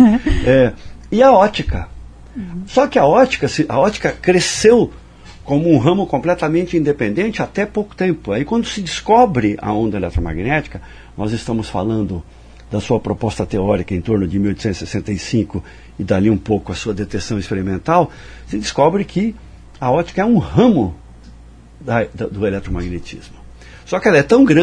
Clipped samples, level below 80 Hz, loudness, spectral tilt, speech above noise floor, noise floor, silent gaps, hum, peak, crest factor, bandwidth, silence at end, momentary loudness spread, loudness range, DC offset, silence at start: under 0.1%; -34 dBFS; -16 LUFS; -6 dB/octave; 24 dB; -40 dBFS; none; none; 0 dBFS; 16 dB; 10.5 kHz; 0 s; 13 LU; 6 LU; under 0.1%; 0 s